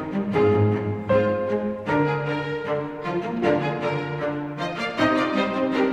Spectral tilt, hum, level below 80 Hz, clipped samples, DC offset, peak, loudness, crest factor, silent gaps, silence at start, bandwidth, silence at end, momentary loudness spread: -7.5 dB/octave; none; -54 dBFS; under 0.1%; under 0.1%; -8 dBFS; -24 LUFS; 16 dB; none; 0 s; 10 kHz; 0 s; 7 LU